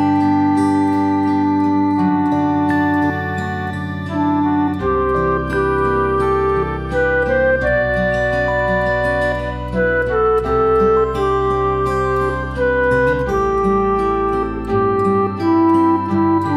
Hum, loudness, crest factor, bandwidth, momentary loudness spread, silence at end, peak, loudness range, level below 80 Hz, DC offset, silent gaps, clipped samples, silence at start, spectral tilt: none; -17 LUFS; 12 dB; 11.5 kHz; 5 LU; 0 s; -4 dBFS; 2 LU; -32 dBFS; under 0.1%; none; under 0.1%; 0 s; -8 dB/octave